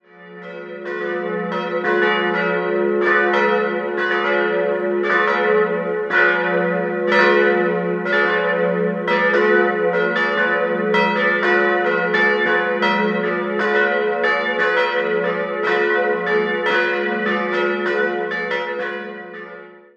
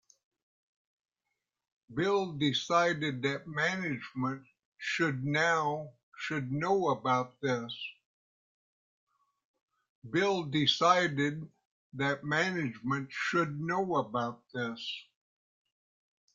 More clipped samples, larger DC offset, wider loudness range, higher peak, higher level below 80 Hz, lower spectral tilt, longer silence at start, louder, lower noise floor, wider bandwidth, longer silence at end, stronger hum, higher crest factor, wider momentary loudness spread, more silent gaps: neither; neither; second, 2 LU vs 5 LU; first, 0 dBFS vs -10 dBFS; about the same, -70 dBFS vs -72 dBFS; first, -6.5 dB/octave vs -5 dB/octave; second, 0.15 s vs 1.9 s; first, -18 LUFS vs -31 LUFS; second, -39 dBFS vs -87 dBFS; about the same, 7.4 kHz vs 7.8 kHz; second, 0.2 s vs 1.3 s; neither; about the same, 18 dB vs 22 dB; second, 8 LU vs 13 LU; second, none vs 4.65-4.72 s, 6.03-6.12 s, 8.05-9.07 s, 9.45-9.54 s, 9.62-9.68 s, 9.89-10.02 s, 11.65-11.92 s